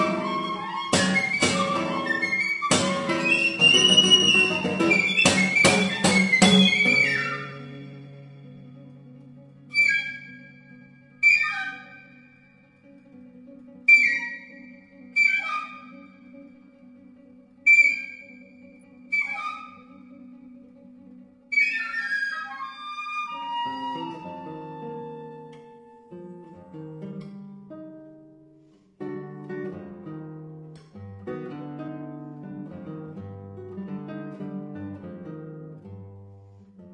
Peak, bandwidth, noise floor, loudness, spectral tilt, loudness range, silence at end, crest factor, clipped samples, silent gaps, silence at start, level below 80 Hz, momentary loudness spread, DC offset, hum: -2 dBFS; 11.5 kHz; -56 dBFS; -20 LUFS; -3 dB/octave; 22 LU; 0 s; 24 dB; under 0.1%; none; 0 s; -66 dBFS; 26 LU; under 0.1%; none